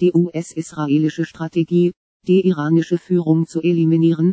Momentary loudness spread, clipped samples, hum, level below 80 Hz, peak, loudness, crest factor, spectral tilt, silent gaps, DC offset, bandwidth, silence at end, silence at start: 9 LU; under 0.1%; none; -66 dBFS; -4 dBFS; -18 LUFS; 12 dB; -8 dB/octave; 1.97-2.20 s; under 0.1%; 8 kHz; 0 s; 0 s